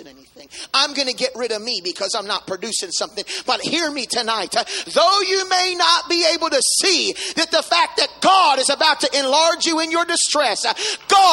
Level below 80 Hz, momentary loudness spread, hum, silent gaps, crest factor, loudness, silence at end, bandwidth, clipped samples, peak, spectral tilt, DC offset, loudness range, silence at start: -64 dBFS; 8 LU; none; none; 18 dB; -17 LUFS; 0 s; 16 kHz; under 0.1%; -2 dBFS; 0 dB/octave; under 0.1%; 6 LU; 0 s